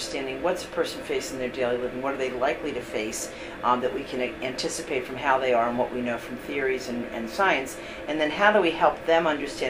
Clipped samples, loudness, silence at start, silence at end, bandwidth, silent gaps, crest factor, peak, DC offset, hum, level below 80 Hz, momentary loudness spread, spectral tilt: under 0.1%; -26 LUFS; 0 s; 0 s; 16 kHz; none; 22 dB; -4 dBFS; under 0.1%; none; -52 dBFS; 10 LU; -3.5 dB/octave